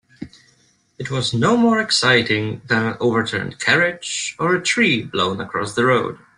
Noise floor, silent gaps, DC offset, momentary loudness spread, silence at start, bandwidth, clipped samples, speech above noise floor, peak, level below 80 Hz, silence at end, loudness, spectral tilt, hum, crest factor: -59 dBFS; none; under 0.1%; 9 LU; 0.2 s; 11 kHz; under 0.1%; 40 dB; -2 dBFS; -56 dBFS; 0.2 s; -18 LUFS; -4 dB/octave; none; 18 dB